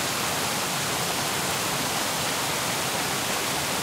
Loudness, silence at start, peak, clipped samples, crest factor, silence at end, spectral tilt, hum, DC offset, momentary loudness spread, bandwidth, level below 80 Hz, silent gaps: -25 LUFS; 0 s; -12 dBFS; under 0.1%; 14 dB; 0 s; -2 dB/octave; none; under 0.1%; 0 LU; 16 kHz; -56 dBFS; none